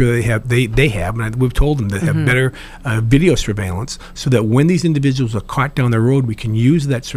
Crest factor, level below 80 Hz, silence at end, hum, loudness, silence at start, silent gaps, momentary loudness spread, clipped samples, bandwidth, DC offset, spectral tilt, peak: 14 dB; -28 dBFS; 0 s; none; -16 LUFS; 0 s; none; 8 LU; under 0.1%; 15 kHz; under 0.1%; -6.5 dB/octave; 0 dBFS